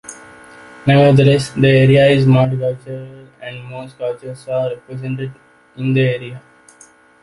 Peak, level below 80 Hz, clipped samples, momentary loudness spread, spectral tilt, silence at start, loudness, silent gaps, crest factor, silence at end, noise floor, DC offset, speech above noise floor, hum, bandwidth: -2 dBFS; -48 dBFS; under 0.1%; 21 LU; -7 dB/octave; 0.1 s; -14 LUFS; none; 14 dB; 0.85 s; -47 dBFS; under 0.1%; 32 dB; none; 11.5 kHz